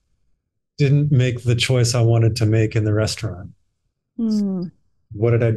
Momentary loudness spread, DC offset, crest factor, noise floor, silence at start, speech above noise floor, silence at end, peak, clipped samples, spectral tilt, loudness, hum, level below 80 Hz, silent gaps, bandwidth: 14 LU; 0.2%; 12 dB; -72 dBFS; 0.8 s; 55 dB; 0 s; -6 dBFS; under 0.1%; -6 dB/octave; -19 LUFS; none; -48 dBFS; none; 12.5 kHz